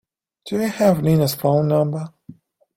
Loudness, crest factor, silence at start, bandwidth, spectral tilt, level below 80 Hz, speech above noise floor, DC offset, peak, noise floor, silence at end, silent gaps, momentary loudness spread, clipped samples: -19 LUFS; 18 dB; 0.45 s; 16.5 kHz; -7 dB/octave; -56 dBFS; 28 dB; under 0.1%; -2 dBFS; -46 dBFS; 0.45 s; none; 11 LU; under 0.1%